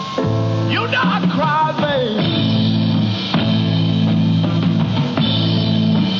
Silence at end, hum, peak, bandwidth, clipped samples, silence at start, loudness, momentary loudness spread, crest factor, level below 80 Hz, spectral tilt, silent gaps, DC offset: 0 s; none; -6 dBFS; 7 kHz; under 0.1%; 0 s; -16 LUFS; 2 LU; 10 dB; -46 dBFS; -7.5 dB/octave; none; under 0.1%